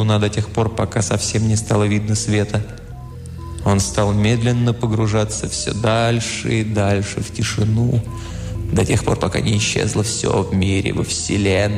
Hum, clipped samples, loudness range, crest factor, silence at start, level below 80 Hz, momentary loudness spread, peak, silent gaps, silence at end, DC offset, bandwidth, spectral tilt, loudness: none; under 0.1%; 1 LU; 14 dB; 0 s; -36 dBFS; 8 LU; -4 dBFS; none; 0 s; under 0.1%; 13 kHz; -5 dB/octave; -19 LUFS